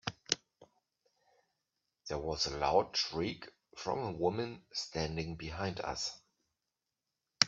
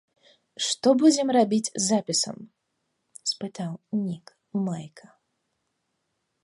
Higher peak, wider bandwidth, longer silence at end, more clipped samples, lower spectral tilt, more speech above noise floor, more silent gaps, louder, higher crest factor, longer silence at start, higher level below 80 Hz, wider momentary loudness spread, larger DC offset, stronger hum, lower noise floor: first, -4 dBFS vs -8 dBFS; second, 7.8 kHz vs 11.5 kHz; second, 0 s vs 1.45 s; neither; about the same, -3.5 dB/octave vs -4 dB/octave; about the same, 53 dB vs 53 dB; neither; second, -36 LUFS vs -25 LUFS; first, 34 dB vs 20 dB; second, 0.05 s vs 0.6 s; first, -60 dBFS vs -76 dBFS; second, 12 LU vs 17 LU; neither; neither; first, -89 dBFS vs -77 dBFS